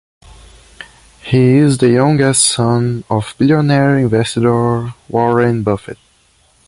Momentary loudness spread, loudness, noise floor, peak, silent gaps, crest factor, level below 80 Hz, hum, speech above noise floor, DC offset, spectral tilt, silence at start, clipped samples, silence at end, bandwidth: 9 LU; -13 LUFS; -53 dBFS; 0 dBFS; none; 14 dB; -44 dBFS; none; 41 dB; under 0.1%; -5.5 dB/octave; 0.8 s; under 0.1%; 0.75 s; 11.5 kHz